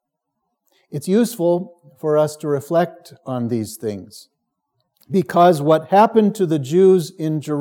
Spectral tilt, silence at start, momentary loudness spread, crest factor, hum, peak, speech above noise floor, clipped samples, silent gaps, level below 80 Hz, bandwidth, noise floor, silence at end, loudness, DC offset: -7 dB/octave; 0.9 s; 15 LU; 16 dB; none; -2 dBFS; 59 dB; under 0.1%; none; -74 dBFS; 17.5 kHz; -76 dBFS; 0 s; -18 LUFS; under 0.1%